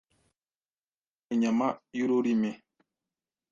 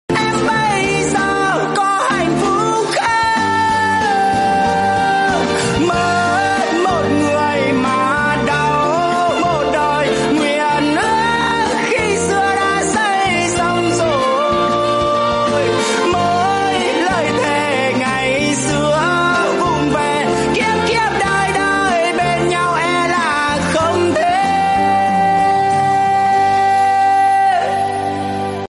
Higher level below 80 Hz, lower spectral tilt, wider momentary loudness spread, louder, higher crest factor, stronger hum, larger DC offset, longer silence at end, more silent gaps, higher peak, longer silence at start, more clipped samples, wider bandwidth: second, -76 dBFS vs -42 dBFS; first, -6.5 dB/octave vs -4 dB/octave; first, 7 LU vs 2 LU; second, -29 LUFS vs -15 LUFS; first, 18 dB vs 10 dB; neither; neither; first, 0.95 s vs 0 s; neither; second, -14 dBFS vs -6 dBFS; first, 1.3 s vs 0.1 s; neither; second, 7.4 kHz vs 11.5 kHz